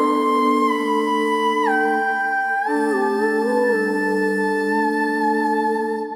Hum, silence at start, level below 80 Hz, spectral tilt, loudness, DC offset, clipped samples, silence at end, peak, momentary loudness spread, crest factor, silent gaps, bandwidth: none; 0 s; -68 dBFS; -5 dB/octave; -19 LUFS; under 0.1%; under 0.1%; 0 s; -6 dBFS; 3 LU; 12 dB; none; 16 kHz